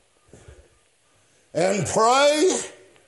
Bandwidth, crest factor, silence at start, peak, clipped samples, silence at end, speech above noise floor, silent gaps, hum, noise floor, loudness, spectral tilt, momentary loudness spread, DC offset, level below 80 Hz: 11.5 kHz; 18 dB; 1.55 s; -6 dBFS; under 0.1%; 0.35 s; 42 dB; none; none; -62 dBFS; -20 LUFS; -3.5 dB/octave; 13 LU; under 0.1%; -60 dBFS